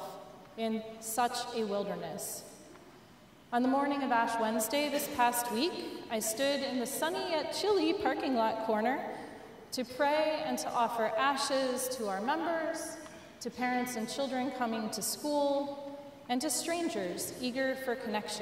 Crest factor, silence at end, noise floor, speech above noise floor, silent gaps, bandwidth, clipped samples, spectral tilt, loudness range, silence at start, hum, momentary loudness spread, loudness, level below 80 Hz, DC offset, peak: 20 dB; 0 s; -57 dBFS; 25 dB; none; 16 kHz; under 0.1%; -3 dB/octave; 3 LU; 0 s; none; 12 LU; -33 LUFS; -72 dBFS; under 0.1%; -14 dBFS